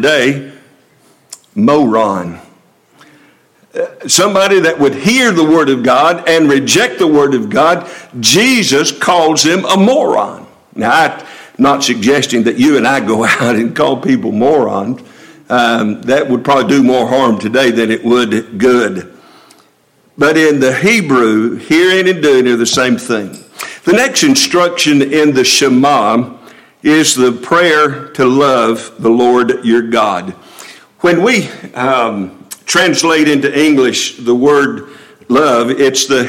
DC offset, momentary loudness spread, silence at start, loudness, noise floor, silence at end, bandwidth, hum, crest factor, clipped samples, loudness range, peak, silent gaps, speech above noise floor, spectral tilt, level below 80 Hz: under 0.1%; 9 LU; 0 s; -10 LUFS; -51 dBFS; 0 s; 17 kHz; none; 12 dB; under 0.1%; 3 LU; 0 dBFS; none; 41 dB; -3.5 dB/octave; -54 dBFS